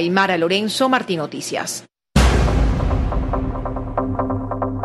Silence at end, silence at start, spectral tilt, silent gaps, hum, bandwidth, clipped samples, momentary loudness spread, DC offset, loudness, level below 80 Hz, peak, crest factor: 0 s; 0 s; -5 dB/octave; none; none; 12.5 kHz; under 0.1%; 8 LU; under 0.1%; -20 LUFS; -24 dBFS; -2 dBFS; 18 dB